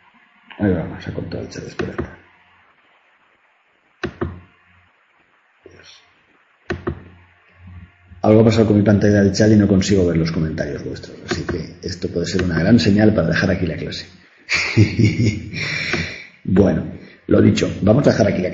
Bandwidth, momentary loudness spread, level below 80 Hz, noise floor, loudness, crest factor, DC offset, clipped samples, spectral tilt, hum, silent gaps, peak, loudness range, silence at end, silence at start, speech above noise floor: 7.8 kHz; 16 LU; -42 dBFS; -59 dBFS; -17 LUFS; 18 dB; under 0.1%; under 0.1%; -6.5 dB/octave; none; none; 0 dBFS; 20 LU; 0 s; 0.5 s; 43 dB